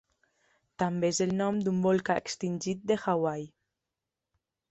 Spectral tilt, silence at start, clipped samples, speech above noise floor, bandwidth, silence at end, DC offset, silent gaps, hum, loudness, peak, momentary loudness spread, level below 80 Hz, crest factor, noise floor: -5.5 dB/octave; 0.8 s; under 0.1%; 59 dB; 8.2 kHz; 1.25 s; under 0.1%; none; none; -30 LUFS; -14 dBFS; 7 LU; -68 dBFS; 18 dB; -88 dBFS